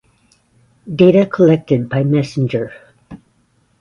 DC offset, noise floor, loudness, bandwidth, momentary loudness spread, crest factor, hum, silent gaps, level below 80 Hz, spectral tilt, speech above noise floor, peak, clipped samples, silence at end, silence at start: under 0.1%; -59 dBFS; -14 LUFS; 10 kHz; 12 LU; 16 dB; none; none; -52 dBFS; -8.5 dB/octave; 45 dB; 0 dBFS; under 0.1%; 0.65 s; 0.85 s